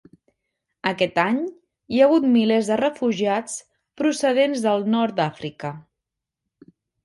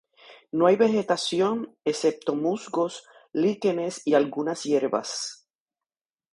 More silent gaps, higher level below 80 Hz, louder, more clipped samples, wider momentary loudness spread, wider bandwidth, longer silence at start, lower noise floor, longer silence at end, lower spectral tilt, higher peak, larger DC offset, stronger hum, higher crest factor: neither; first, -66 dBFS vs -74 dBFS; first, -21 LUFS vs -25 LUFS; neither; first, 15 LU vs 10 LU; about the same, 11.5 kHz vs 11.5 kHz; first, 0.85 s vs 0.3 s; second, -84 dBFS vs under -90 dBFS; first, 1.25 s vs 0.95 s; about the same, -5 dB/octave vs -4.5 dB/octave; about the same, -4 dBFS vs -6 dBFS; neither; neither; about the same, 18 dB vs 20 dB